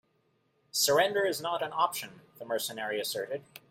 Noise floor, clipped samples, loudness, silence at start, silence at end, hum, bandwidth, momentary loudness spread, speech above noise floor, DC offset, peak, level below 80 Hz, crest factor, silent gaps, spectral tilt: -73 dBFS; under 0.1%; -30 LUFS; 0.75 s; 0.1 s; none; 16.5 kHz; 14 LU; 42 dB; under 0.1%; -12 dBFS; -76 dBFS; 20 dB; none; -1.5 dB/octave